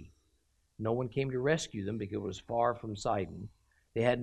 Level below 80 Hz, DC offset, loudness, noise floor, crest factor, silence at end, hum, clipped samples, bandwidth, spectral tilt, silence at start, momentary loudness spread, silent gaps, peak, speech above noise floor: -60 dBFS; under 0.1%; -34 LUFS; -73 dBFS; 20 dB; 0 s; none; under 0.1%; 12 kHz; -6 dB/octave; 0 s; 10 LU; none; -16 dBFS; 40 dB